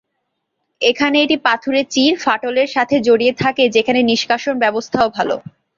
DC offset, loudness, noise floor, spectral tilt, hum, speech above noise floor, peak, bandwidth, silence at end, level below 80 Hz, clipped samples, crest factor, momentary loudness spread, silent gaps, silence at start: under 0.1%; -15 LUFS; -73 dBFS; -4 dB/octave; none; 58 dB; 0 dBFS; 7.6 kHz; 0.35 s; -56 dBFS; under 0.1%; 16 dB; 4 LU; none; 0.8 s